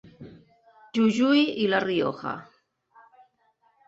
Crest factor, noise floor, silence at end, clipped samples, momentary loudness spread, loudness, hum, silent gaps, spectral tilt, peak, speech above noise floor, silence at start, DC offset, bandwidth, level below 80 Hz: 18 dB; -67 dBFS; 1.45 s; under 0.1%; 14 LU; -24 LUFS; none; none; -5.5 dB/octave; -8 dBFS; 44 dB; 0.2 s; under 0.1%; 8 kHz; -68 dBFS